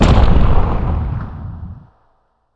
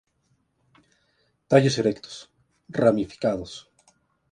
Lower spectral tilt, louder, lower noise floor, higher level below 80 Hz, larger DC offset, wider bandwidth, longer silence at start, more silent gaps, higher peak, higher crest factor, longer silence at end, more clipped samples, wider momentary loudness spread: first, -7.5 dB/octave vs -6 dB/octave; first, -17 LUFS vs -23 LUFS; second, -59 dBFS vs -70 dBFS; first, -16 dBFS vs -58 dBFS; neither; second, 8 kHz vs 10.5 kHz; second, 0 s vs 1.5 s; neither; first, 0 dBFS vs -4 dBFS; second, 14 dB vs 22 dB; about the same, 0.75 s vs 0.7 s; neither; about the same, 19 LU vs 21 LU